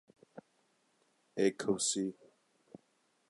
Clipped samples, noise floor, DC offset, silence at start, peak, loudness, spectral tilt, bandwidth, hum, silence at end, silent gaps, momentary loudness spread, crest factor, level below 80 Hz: under 0.1%; -75 dBFS; under 0.1%; 0.35 s; -18 dBFS; -34 LUFS; -3.5 dB/octave; 11.5 kHz; none; 1.2 s; none; 9 LU; 22 dB; -80 dBFS